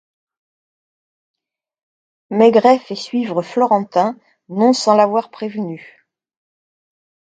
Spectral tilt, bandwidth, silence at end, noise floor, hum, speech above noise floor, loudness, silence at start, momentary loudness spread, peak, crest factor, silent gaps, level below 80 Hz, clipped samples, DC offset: -5.5 dB/octave; 9.4 kHz; 1.55 s; under -90 dBFS; none; over 75 dB; -16 LUFS; 2.3 s; 14 LU; 0 dBFS; 18 dB; none; -70 dBFS; under 0.1%; under 0.1%